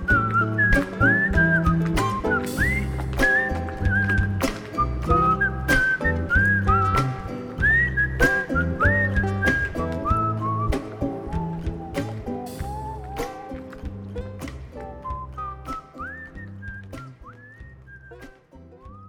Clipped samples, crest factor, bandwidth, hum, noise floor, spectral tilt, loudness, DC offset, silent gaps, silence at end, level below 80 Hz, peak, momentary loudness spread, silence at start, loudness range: under 0.1%; 18 dB; 19.5 kHz; none; -48 dBFS; -6.5 dB/octave; -22 LUFS; under 0.1%; none; 0 s; -32 dBFS; -6 dBFS; 17 LU; 0 s; 15 LU